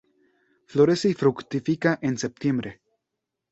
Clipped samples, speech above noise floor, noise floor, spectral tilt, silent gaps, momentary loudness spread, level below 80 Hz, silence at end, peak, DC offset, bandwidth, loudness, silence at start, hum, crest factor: under 0.1%; 60 dB; -83 dBFS; -6 dB/octave; none; 9 LU; -62 dBFS; 0.8 s; -6 dBFS; under 0.1%; 8.2 kHz; -24 LUFS; 0.7 s; none; 20 dB